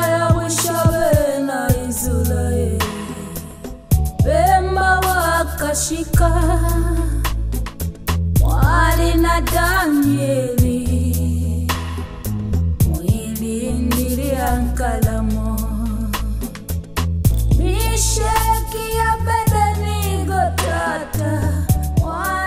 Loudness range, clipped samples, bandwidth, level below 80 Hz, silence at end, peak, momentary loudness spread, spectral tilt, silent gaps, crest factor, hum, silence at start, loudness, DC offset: 4 LU; under 0.1%; 16 kHz; -22 dBFS; 0 s; -2 dBFS; 8 LU; -5.5 dB/octave; none; 16 dB; none; 0 s; -18 LUFS; under 0.1%